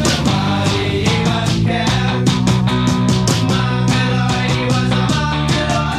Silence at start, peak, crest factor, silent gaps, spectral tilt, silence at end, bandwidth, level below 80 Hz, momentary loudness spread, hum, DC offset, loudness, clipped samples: 0 s; -2 dBFS; 14 dB; none; -5 dB/octave; 0 s; 14 kHz; -32 dBFS; 1 LU; none; under 0.1%; -15 LUFS; under 0.1%